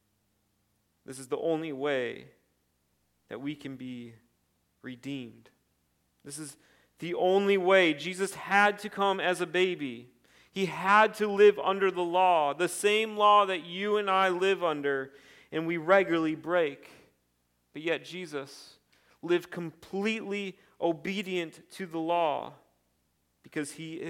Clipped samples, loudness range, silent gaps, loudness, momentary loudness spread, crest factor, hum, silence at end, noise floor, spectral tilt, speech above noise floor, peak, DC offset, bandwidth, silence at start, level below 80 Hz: under 0.1%; 17 LU; none; -28 LUFS; 20 LU; 22 dB; none; 0 s; -75 dBFS; -4.5 dB/octave; 46 dB; -8 dBFS; under 0.1%; 16 kHz; 1.1 s; -78 dBFS